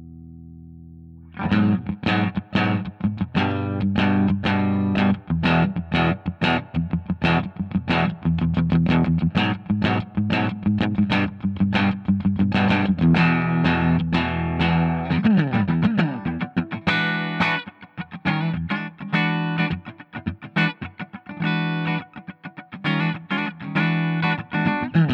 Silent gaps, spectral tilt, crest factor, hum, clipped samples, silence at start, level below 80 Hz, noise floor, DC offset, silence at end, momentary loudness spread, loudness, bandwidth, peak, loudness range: none; -8 dB/octave; 18 dB; none; under 0.1%; 0 s; -46 dBFS; -42 dBFS; under 0.1%; 0 s; 9 LU; -22 LUFS; 6.2 kHz; -4 dBFS; 5 LU